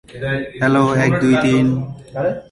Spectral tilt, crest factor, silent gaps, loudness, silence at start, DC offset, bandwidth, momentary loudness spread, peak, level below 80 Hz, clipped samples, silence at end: -7 dB/octave; 14 dB; none; -17 LUFS; 0.1 s; under 0.1%; 11.5 kHz; 9 LU; -4 dBFS; -46 dBFS; under 0.1%; 0.1 s